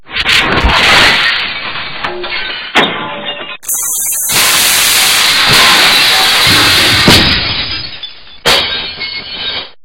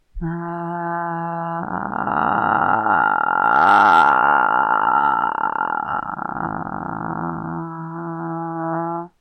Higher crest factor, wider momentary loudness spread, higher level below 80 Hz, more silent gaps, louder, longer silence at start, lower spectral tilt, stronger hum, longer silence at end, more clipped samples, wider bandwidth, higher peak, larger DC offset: second, 10 dB vs 16 dB; about the same, 14 LU vs 14 LU; first, -30 dBFS vs -48 dBFS; neither; first, -7 LUFS vs -19 LUFS; second, 0 s vs 0.15 s; second, -1 dB/octave vs -7 dB/octave; neither; second, 0 s vs 0.15 s; first, 0.7% vs under 0.1%; first, over 20 kHz vs 8.8 kHz; first, 0 dBFS vs -4 dBFS; neither